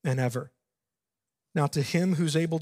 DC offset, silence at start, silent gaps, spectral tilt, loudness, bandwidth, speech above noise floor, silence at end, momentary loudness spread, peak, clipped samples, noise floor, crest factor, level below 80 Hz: under 0.1%; 0.05 s; none; -6 dB/octave; -28 LUFS; 16 kHz; 63 dB; 0 s; 10 LU; -12 dBFS; under 0.1%; -89 dBFS; 16 dB; -70 dBFS